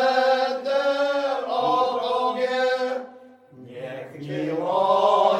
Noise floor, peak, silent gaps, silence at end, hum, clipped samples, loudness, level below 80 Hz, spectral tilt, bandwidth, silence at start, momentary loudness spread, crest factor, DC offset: -47 dBFS; -6 dBFS; none; 0 s; none; under 0.1%; -23 LUFS; -76 dBFS; -4.5 dB/octave; 10.5 kHz; 0 s; 16 LU; 16 dB; under 0.1%